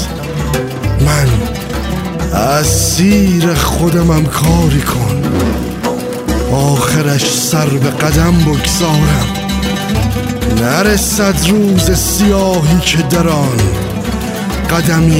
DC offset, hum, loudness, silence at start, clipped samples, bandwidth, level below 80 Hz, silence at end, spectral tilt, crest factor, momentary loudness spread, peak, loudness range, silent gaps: under 0.1%; none; -12 LUFS; 0 s; under 0.1%; 16.5 kHz; -22 dBFS; 0 s; -5 dB/octave; 12 dB; 7 LU; 0 dBFS; 2 LU; none